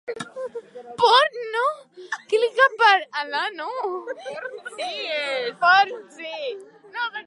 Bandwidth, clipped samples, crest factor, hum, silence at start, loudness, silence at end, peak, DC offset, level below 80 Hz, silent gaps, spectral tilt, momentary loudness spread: 11.5 kHz; under 0.1%; 20 dB; none; 0.05 s; -21 LUFS; 0.05 s; -4 dBFS; under 0.1%; -80 dBFS; none; -1.5 dB/octave; 18 LU